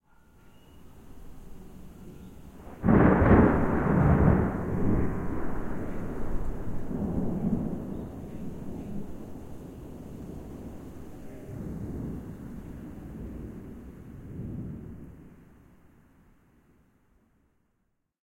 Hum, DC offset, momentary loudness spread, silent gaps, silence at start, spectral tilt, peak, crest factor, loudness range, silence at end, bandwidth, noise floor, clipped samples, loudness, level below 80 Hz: none; under 0.1%; 26 LU; none; 0.45 s; -10 dB/octave; -6 dBFS; 24 dB; 19 LU; 2.8 s; 15.5 kHz; -76 dBFS; under 0.1%; -28 LUFS; -40 dBFS